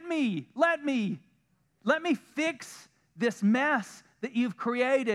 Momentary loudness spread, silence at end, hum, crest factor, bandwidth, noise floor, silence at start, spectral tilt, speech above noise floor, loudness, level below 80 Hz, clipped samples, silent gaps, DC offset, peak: 13 LU; 0 s; none; 18 dB; 13 kHz; -71 dBFS; 0 s; -5.5 dB/octave; 42 dB; -29 LUFS; -84 dBFS; under 0.1%; none; under 0.1%; -10 dBFS